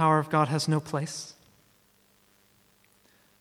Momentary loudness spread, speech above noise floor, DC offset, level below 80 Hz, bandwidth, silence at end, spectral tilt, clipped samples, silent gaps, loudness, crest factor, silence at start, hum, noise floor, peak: 15 LU; 38 dB; under 0.1%; -74 dBFS; 14.5 kHz; 2.1 s; -5.5 dB/octave; under 0.1%; none; -27 LUFS; 20 dB; 0 s; 50 Hz at -70 dBFS; -64 dBFS; -10 dBFS